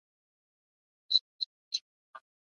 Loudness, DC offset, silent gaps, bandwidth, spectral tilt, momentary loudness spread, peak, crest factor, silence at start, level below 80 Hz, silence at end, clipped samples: -31 LUFS; under 0.1%; 1.21-1.39 s, 1.46-1.71 s, 1.81-2.13 s; 11 kHz; 6.5 dB/octave; 10 LU; -10 dBFS; 28 dB; 1.1 s; under -90 dBFS; 0.35 s; under 0.1%